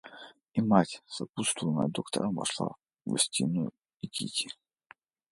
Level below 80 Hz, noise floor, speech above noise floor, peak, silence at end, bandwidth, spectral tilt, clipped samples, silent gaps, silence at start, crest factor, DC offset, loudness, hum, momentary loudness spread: -70 dBFS; -60 dBFS; 30 dB; -6 dBFS; 0.8 s; 11.5 kHz; -4 dB/octave; under 0.1%; 1.29-1.33 s, 3.96-4.00 s; 0.05 s; 26 dB; under 0.1%; -31 LUFS; none; 15 LU